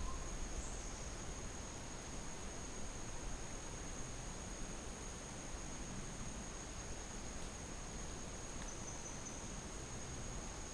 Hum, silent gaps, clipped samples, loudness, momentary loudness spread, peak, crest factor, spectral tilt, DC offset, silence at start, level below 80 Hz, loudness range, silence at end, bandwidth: none; none; under 0.1%; -48 LUFS; 1 LU; -30 dBFS; 16 dB; -3.5 dB/octave; under 0.1%; 0 s; -50 dBFS; 0 LU; 0 s; 10.5 kHz